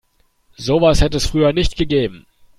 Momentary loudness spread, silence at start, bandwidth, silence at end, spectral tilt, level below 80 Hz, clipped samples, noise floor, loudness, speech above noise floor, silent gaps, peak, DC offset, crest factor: 7 LU; 0.6 s; 13.5 kHz; 0.4 s; -5.5 dB/octave; -26 dBFS; under 0.1%; -57 dBFS; -17 LUFS; 41 dB; none; -2 dBFS; under 0.1%; 16 dB